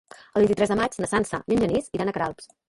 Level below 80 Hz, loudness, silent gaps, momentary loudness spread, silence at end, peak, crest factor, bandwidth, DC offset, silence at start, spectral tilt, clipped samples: -50 dBFS; -24 LUFS; none; 8 LU; 0.25 s; -8 dBFS; 16 dB; 11.5 kHz; under 0.1%; 0.35 s; -5.5 dB/octave; under 0.1%